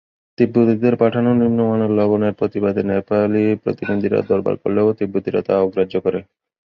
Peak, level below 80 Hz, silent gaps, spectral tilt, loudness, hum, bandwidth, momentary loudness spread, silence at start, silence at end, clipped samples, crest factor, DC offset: -2 dBFS; -52 dBFS; none; -10.5 dB/octave; -18 LUFS; none; 5.8 kHz; 5 LU; 0.4 s; 0.4 s; under 0.1%; 16 dB; under 0.1%